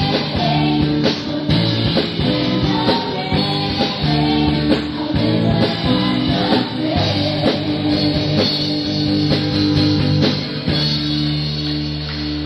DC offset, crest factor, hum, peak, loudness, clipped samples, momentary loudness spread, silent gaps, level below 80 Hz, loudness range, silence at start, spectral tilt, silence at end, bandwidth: under 0.1%; 16 dB; none; -2 dBFS; -17 LUFS; under 0.1%; 3 LU; none; -36 dBFS; 1 LU; 0 s; -7 dB/octave; 0 s; 10 kHz